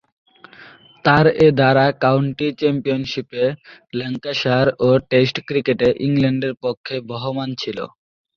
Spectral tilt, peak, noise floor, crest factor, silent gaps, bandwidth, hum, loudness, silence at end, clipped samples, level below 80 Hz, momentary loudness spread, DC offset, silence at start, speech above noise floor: -7 dB/octave; -2 dBFS; -45 dBFS; 16 dB; 6.77-6.84 s; 7 kHz; none; -18 LUFS; 0.5 s; under 0.1%; -52 dBFS; 13 LU; under 0.1%; 0.6 s; 27 dB